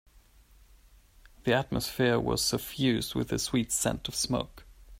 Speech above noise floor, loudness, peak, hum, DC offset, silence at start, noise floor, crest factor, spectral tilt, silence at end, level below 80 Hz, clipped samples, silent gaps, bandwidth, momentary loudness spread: 29 dB; -29 LUFS; -12 dBFS; none; under 0.1%; 1.45 s; -58 dBFS; 20 dB; -4 dB/octave; 0 s; -50 dBFS; under 0.1%; none; 16 kHz; 5 LU